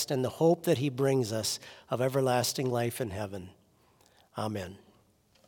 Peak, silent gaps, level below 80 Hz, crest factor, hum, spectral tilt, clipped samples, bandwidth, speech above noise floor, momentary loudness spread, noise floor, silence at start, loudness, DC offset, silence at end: -14 dBFS; none; -72 dBFS; 18 dB; none; -5 dB/octave; under 0.1%; 18 kHz; 36 dB; 13 LU; -66 dBFS; 0 s; -30 LUFS; under 0.1%; 0.7 s